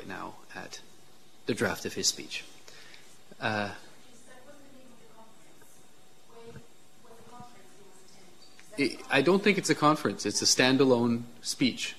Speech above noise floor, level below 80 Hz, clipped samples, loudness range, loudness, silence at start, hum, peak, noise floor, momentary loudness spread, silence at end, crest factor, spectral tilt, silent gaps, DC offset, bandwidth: 32 dB; -70 dBFS; under 0.1%; 14 LU; -27 LUFS; 0 s; none; -8 dBFS; -60 dBFS; 27 LU; 0.05 s; 24 dB; -3.5 dB/octave; none; 0.4%; 14 kHz